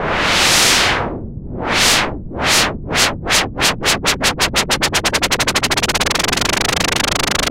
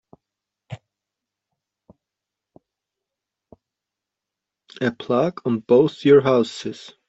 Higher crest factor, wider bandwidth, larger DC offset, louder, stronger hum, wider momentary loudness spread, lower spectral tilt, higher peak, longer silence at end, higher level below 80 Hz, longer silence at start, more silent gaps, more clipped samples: about the same, 16 dB vs 20 dB; first, 17 kHz vs 8 kHz; neither; first, -14 LUFS vs -19 LUFS; neither; second, 7 LU vs 25 LU; second, -1.5 dB/octave vs -7 dB/octave; first, 0 dBFS vs -4 dBFS; second, 0 s vs 0.35 s; first, -32 dBFS vs -64 dBFS; second, 0 s vs 0.7 s; neither; neither